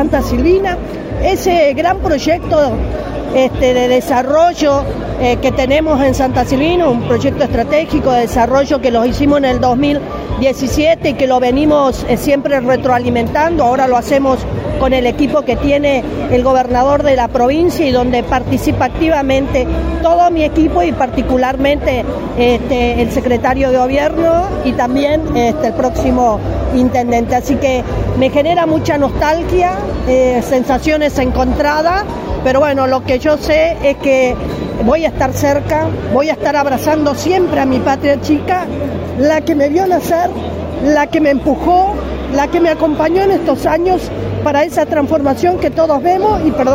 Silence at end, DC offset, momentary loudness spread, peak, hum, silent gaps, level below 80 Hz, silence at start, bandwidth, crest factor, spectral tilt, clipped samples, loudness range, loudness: 0 s; under 0.1%; 4 LU; 0 dBFS; none; none; -26 dBFS; 0 s; 16 kHz; 12 dB; -6 dB/octave; under 0.1%; 1 LU; -13 LUFS